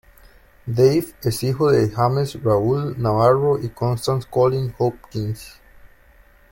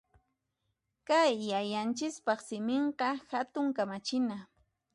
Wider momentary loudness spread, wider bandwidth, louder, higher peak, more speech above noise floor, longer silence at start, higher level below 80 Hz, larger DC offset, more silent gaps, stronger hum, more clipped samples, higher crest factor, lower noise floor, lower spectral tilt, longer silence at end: first, 11 LU vs 8 LU; first, 16.5 kHz vs 11.5 kHz; first, -20 LUFS vs -32 LUFS; first, -4 dBFS vs -16 dBFS; second, 32 dB vs 51 dB; second, 0.65 s vs 1.1 s; first, -48 dBFS vs -78 dBFS; neither; neither; neither; neither; about the same, 18 dB vs 18 dB; second, -51 dBFS vs -83 dBFS; first, -7 dB/octave vs -4 dB/octave; first, 0.65 s vs 0.5 s